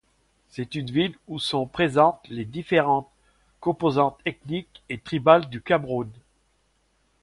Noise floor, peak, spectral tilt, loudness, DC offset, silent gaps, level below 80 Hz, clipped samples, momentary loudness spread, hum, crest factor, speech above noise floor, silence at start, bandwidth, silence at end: -67 dBFS; -2 dBFS; -6.5 dB/octave; -24 LUFS; under 0.1%; none; -58 dBFS; under 0.1%; 15 LU; none; 24 dB; 44 dB; 0.55 s; 11.5 kHz; 1.1 s